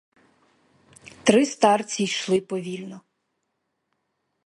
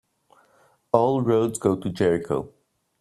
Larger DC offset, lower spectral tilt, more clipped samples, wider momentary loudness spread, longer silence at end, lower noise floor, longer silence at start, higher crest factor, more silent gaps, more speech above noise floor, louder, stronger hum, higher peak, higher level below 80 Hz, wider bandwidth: neither; second, -4 dB/octave vs -6.5 dB/octave; neither; first, 15 LU vs 9 LU; first, 1.45 s vs 0.55 s; first, -77 dBFS vs -61 dBFS; about the same, 1.05 s vs 0.95 s; about the same, 24 dB vs 22 dB; neither; first, 55 dB vs 39 dB; about the same, -22 LUFS vs -23 LUFS; neither; about the same, -2 dBFS vs -2 dBFS; second, -68 dBFS vs -58 dBFS; second, 11.5 kHz vs 13 kHz